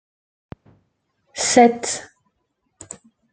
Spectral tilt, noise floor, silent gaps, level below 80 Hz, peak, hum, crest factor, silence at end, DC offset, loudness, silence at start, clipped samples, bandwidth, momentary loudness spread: -2.5 dB/octave; -72 dBFS; none; -62 dBFS; -2 dBFS; none; 22 dB; 1.3 s; under 0.1%; -17 LUFS; 1.35 s; under 0.1%; 9.4 kHz; 25 LU